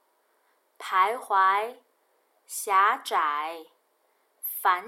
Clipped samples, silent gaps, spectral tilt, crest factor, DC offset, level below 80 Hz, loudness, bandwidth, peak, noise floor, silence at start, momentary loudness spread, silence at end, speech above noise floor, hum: under 0.1%; none; 0.5 dB/octave; 18 dB; under 0.1%; under -90 dBFS; -25 LUFS; 17 kHz; -10 dBFS; -69 dBFS; 0.8 s; 15 LU; 0 s; 44 dB; none